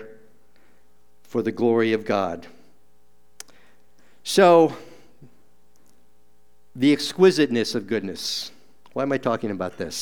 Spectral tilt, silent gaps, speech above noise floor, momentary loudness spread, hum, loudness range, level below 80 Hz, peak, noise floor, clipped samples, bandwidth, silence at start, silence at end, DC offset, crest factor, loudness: -5 dB/octave; none; 43 dB; 20 LU; none; 5 LU; -66 dBFS; -2 dBFS; -64 dBFS; under 0.1%; 18 kHz; 0 s; 0 s; 0.5%; 22 dB; -21 LUFS